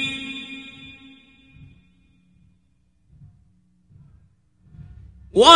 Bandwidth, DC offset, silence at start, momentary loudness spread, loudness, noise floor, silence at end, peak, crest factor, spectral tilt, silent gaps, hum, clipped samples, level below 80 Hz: 12 kHz; under 0.1%; 0 s; 25 LU; -24 LUFS; -64 dBFS; 0 s; 0 dBFS; 24 dB; -2.5 dB/octave; none; none; under 0.1%; -52 dBFS